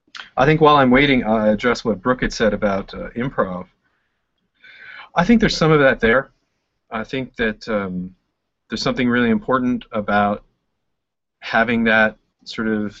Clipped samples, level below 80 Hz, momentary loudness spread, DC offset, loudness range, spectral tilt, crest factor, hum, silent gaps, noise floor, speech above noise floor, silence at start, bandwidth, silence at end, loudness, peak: under 0.1%; -42 dBFS; 16 LU; under 0.1%; 6 LU; -6 dB/octave; 18 dB; none; none; -80 dBFS; 63 dB; 0.15 s; 7.8 kHz; 0.1 s; -18 LUFS; -2 dBFS